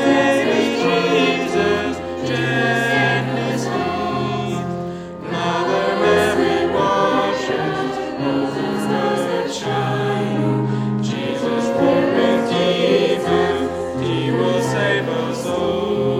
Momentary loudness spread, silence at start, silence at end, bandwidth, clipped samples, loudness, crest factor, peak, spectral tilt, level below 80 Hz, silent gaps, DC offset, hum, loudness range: 7 LU; 0 s; 0 s; 16 kHz; under 0.1%; -19 LUFS; 16 dB; -2 dBFS; -5.5 dB/octave; -54 dBFS; none; under 0.1%; none; 3 LU